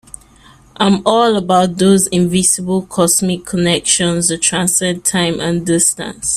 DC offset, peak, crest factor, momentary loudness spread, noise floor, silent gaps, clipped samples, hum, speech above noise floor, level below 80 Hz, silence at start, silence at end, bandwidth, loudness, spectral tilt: under 0.1%; 0 dBFS; 14 dB; 5 LU; -44 dBFS; none; under 0.1%; none; 31 dB; -46 dBFS; 0.8 s; 0 s; 15.5 kHz; -13 LUFS; -3.5 dB/octave